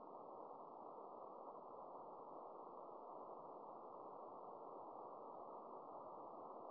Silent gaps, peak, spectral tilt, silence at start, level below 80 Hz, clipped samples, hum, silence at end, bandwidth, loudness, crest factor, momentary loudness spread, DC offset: none; -42 dBFS; -5 dB/octave; 0 s; under -90 dBFS; under 0.1%; none; 0 s; 3.3 kHz; -56 LUFS; 14 dB; 1 LU; under 0.1%